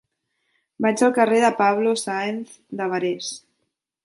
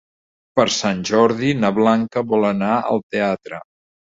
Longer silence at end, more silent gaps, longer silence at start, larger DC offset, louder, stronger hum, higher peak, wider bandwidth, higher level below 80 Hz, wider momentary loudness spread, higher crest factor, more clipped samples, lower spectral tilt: first, 0.65 s vs 0.5 s; second, none vs 3.03-3.10 s; first, 0.8 s vs 0.55 s; neither; second, -21 LUFS vs -18 LUFS; neither; about the same, -4 dBFS vs -2 dBFS; first, 11.5 kHz vs 7.8 kHz; second, -72 dBFS vs -56 dBFS; first, 15 LU vs 7 LU; about the same, 18 dB vs 18 dB; neither; about the same, -4 dB/octave vs -5 dB/octave